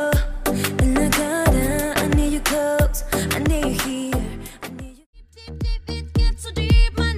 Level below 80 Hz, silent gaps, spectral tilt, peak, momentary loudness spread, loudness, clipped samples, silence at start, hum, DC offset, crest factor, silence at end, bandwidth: -24 dBFS; 5.06-5.13 s; -5 dB/octave; -4 dBFS; 15 LU; -21 LUFS; under 0.1%; 0 s; none; under 0.1%; 16 dB; 0 s; 16 kHz